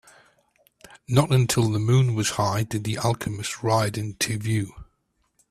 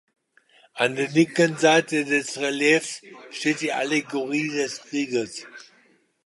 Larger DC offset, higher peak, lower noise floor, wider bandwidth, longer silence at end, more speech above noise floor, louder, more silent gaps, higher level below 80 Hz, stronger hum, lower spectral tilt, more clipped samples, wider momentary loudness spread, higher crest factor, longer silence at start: neither; about the same, -6 dBFS vs -4 dBFS; first, -71 dBFS vs -61 dBFS; first, 14.5 kHz vs 11.5 kHz; about the same, 0.7 s vs 0.65 s; first, 48 dB vs 38 dB; about the same, -24 LUFS vs -23 LUFS; neither; first, -52 dBFS vs -74 dBFS; neither; about the same, -5 dB/octave vs -4 dB/octave; neither; second, 8 LU vs 15 LU; about the same, 20 dB vs 20 dB; first, 0.95 s vs 0.75 s